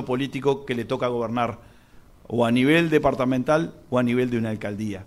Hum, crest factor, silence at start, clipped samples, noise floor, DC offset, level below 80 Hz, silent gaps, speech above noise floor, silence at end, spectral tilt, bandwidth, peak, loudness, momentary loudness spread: none; 18 dB; 0 s; under 0.1%; -50 dBFS; under 0.1%; -50 dBFS; none; 27 dB; 0 s; -6.5 dB/octave; 13.5 kHz; -6 dBFS; -23 LUFS; 10 LU